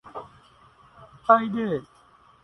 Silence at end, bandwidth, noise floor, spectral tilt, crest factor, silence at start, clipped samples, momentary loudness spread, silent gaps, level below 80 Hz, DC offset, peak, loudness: 0.6 s; 10.5 kHz; -56 dBFS; -8 dB/octave; 24 dB; 0.05 s; under 0.1%; 21 LU; none; -64 dBFS; under 0.1%; -4 dBFS; -23 LUFS